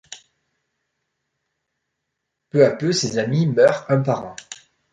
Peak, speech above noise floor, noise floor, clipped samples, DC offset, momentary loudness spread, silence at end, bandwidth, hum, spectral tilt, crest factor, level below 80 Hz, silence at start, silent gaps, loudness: -2 dBFS; 61 dB; -79 dBFS; under 0.1%; under 0.1%; 20 LU; 0.4 s; 10.5 kHz; none; -5.5 dB/octave; 20 dB; -64 dBFS; 0.1 s; none; -19 LUFS